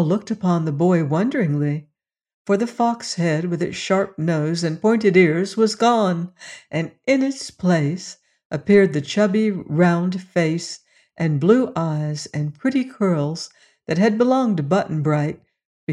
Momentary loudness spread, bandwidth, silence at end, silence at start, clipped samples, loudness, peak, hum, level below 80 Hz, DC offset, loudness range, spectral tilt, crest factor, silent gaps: 12 LU; 11 kHz; 0 s; 0 s; under 0.1%; -20 LUFS; -4 dBFS; none; -62 dBFS; under 0.1%; 3 LU; -6.5 dB/octave; 16 dB; 2.34-2.45 s, 8.45-8.50 s, 15.65-15.87 s